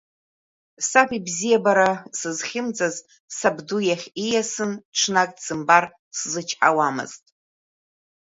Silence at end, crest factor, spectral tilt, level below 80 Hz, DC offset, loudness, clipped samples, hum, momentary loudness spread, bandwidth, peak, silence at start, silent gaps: 1.1 s; 22 dB; -2.5 dB/octave; -68 dBFS; under 0.1%; -22 LUFS; under 0.1%; none; 10 LU; 8 kHz; 0 dBFS; 0.8 s; 3.20-3.28 s, 4.85-4.92 s, 5.99-6.11 s